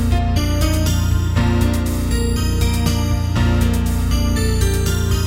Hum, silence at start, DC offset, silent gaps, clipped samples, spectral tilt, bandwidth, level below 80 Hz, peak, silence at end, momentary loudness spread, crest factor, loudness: none; 0 s; 0.2%; none; under 0.1%; -5.5 dB/octave; 16.5 kHz; -20 dBFS; -4 dBFS; 0 s; 2 LU; 12 dB; -18 LUFS